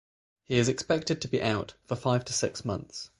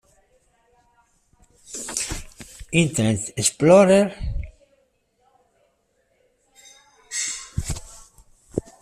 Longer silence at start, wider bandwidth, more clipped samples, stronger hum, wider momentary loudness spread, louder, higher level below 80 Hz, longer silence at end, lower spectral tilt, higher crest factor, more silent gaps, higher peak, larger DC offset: second, 0.5 s vs 1.7 s; second, 11.5 kHz vs 14.5 kHz; neither; neither; second, 8 LU vs 21 LU; second, -29 LUFS vs -21 LUFS; second, -56 dBFS vs -40 dBFS; about the same, 0.15 s vs 0.2 s; about the same, -4.5 dB/octave vs -4.5 dB/octave; about the same, 20 dB vs 22 dB; neither; second, -10 dBFS vs -4 dBFS; neither